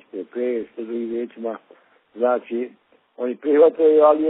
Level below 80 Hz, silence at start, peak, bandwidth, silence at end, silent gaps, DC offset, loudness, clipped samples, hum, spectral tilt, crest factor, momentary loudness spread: -72 dBFS; 0.15 s; -4 dBFS; 4 kHz; 0 s; none; under 0.1%; -21 LUFS; under 0.1%; none; -4.5 dB/octave; 16 dB; 17 LU